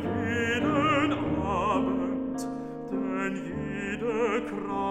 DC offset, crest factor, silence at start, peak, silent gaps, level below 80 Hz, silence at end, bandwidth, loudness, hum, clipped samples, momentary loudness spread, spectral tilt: under 0.1%; 16 dB; 0 s; -12 dBFS; none; -52 dBFS; 0 s; 13.5 kHz; -28 LUFS; none; under 0.1%; 9 LU; -6 dB/octave